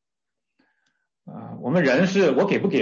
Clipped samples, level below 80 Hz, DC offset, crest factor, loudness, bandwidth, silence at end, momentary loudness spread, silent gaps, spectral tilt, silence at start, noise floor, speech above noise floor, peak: under 0.1%; -68 dBFS; under 0.1%; 14 dB; -20 LUFS; 7.4 kHz; 0 s; 20 LU; none; -6.5 dB/octave; 1.25 s; -87 dBFS; 68 dB; -8 dBFS